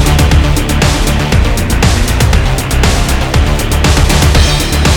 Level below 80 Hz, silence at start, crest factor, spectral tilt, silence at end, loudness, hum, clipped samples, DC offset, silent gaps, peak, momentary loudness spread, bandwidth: -12 dBFS; 0 s; 8 dB; -4.5 dB/octave; 0 s; -10 LUFS; none; under 0.1%; under 0.1%; none; 0 dBFS; 3 LU; 18.5 kHz